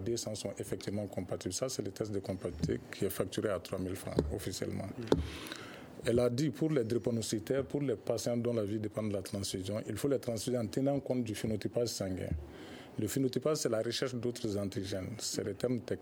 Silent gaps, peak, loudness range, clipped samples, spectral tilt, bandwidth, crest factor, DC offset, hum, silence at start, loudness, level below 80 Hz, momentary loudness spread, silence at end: none; -10 dBFS; 3 LU; under 0.1%; -5.5 dB/octave; over 20 kHz; 26 dB; under 0.1%; none; 0 s; -36 LUFS; -54 dBFS; 7 LU; 0 s